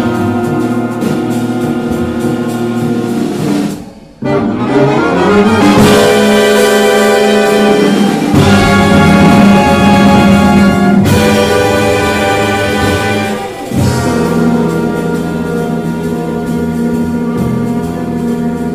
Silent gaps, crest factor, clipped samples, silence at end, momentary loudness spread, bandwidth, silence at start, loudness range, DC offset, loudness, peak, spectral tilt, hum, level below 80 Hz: none; 10 dB; under 0.1%; 0 s; 9 LU; 16 kHz; 0 s; 8 LU; under 0.1%; -10 LUFS; 0 dBFS; -6 dB/octave; none; -32 dBFS